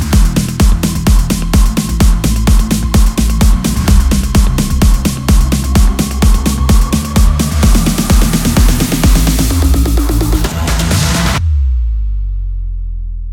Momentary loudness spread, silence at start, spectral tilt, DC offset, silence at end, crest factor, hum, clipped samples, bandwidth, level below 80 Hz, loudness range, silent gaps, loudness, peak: 5 LU; 0 s; -5 dB/octave; under 0.1%; 0 s; 10 dB; none; under 0.1%; 17.5 kHz; -12 dBFS; 2 LU; none; -12 LUFS; 0 dBFS